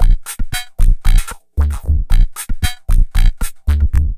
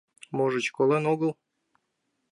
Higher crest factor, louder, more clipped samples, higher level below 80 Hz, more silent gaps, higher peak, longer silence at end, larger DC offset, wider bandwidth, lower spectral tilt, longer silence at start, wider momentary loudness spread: about the same, 12 dB vs 16 dB; first, -19 LUFS vs -26 LUFS; neither; first, -12 dBFS vs -78 dBFS; neither; first, 0 dBFS vs -12 dBFS; second, 0 s vs 1 s; neither; first, 15 kHz vs 11 kHz; second, -4.5 dB/octave vs -6 dB/octave; second, 0 s vs 0.3 s; about the same, 7 LU vs 7 LU